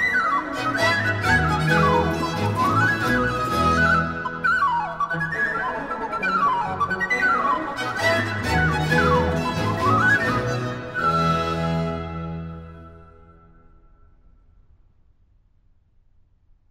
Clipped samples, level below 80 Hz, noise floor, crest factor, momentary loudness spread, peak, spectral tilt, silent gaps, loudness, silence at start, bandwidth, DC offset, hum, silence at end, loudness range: under 0.1%; -40 dBFS; -58 dBFS; 16 dB; 9 LU; -6 dBFS; -5.5 dB/octave; none; -21 LUFS; 0 s; 16 kHz; under 0.1%; none; 3.65 s; 7 LU